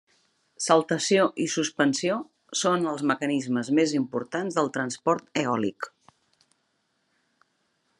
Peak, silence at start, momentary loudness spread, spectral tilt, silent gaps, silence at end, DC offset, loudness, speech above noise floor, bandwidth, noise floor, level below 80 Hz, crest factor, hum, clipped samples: -6 dBFS; 0.6 s; 8 LU; -4 dB/octave; none; 2.1 s; under 0.1%; -25 LUFS; 48 dB; 11.5 kHz; -73 dBFS; -78 dBFS; 22 dB; none; under 0.1%